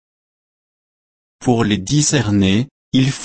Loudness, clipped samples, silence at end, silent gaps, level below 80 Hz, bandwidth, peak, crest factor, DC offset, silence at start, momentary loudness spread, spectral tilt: -16 LUFS; under 0.1%; 0 s; 2.71-2.92 s; -46 dBFS; 8.8 kHz; -2 dBFS; 16 dB; under 0.1%; 1.4 s; 5 LU; -5 dB/octave